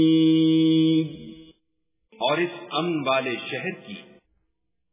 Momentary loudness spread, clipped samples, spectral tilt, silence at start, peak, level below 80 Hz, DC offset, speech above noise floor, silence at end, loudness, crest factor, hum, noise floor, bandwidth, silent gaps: 22 LU; under 0.1%; -4.5 dB/octave; 0 s; -10 dBFS; -68 dBFS; under 0.1%; 54 dB; 0.9 s; -23 LUFS; 14 dB; none; -77 dBFS; 3.9 kHz; none